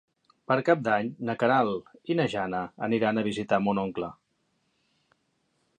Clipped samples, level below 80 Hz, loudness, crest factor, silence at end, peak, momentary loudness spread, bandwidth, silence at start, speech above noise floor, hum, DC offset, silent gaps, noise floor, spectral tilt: under 0.1%; -66 dBFS; -27 LUFS; 22 dB; 1.65 s; -6 dBFS; 8 LU; 9.6 kHz; 0.5 s; 47 dB; none; under 0.1%; none; -74 dBFS; -7 dB/octave